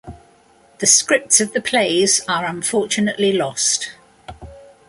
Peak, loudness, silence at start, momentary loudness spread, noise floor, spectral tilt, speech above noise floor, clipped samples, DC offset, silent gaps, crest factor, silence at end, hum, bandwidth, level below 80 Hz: 0 dBFS; -16 LUFS; 0.05 s; 7 LU; -52 dBFS; -1.5 dB/octave; 34 dB; under 0.1%; under 0.1%; none; 20 dB; 0.25 s; none; 12 kHz; -50 dBFS